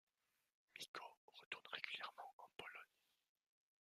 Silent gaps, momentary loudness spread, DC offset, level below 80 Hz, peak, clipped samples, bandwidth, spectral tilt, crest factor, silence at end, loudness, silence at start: 0.88-0.94 s, 1.17-1.28 s, 1.46-1.51 s, 2.33-2.39 s; 13 LU; under 0.1%; under -90 dBFS; -28 dBFS; under 0.1%; 15 kHz; -0.5 dB/octave; 30 dB; 0.95 s; -54 LUFS; 0.75 s